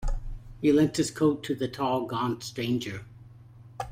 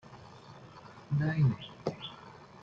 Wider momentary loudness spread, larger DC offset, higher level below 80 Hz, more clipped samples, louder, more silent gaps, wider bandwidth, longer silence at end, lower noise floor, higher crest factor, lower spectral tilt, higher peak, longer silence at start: second, 17 LU vs 23 LU; neither; first, -40 dBFS vs -64 dBFS; neither; first, -28 LUFS vs -33 LUFS; neither; first, 16 kHz vs 7 kHz; about the same, 0 s vs 0.05 s; about the same, -50 dBFS vs -52 dBFS; about the same, 16 dB vs 18 dB; second, -5.5 dB/octave vs -8 dB/octave; first, -12 dBFS vs -16 dBFS; about the same, 0 s vs 0.05 s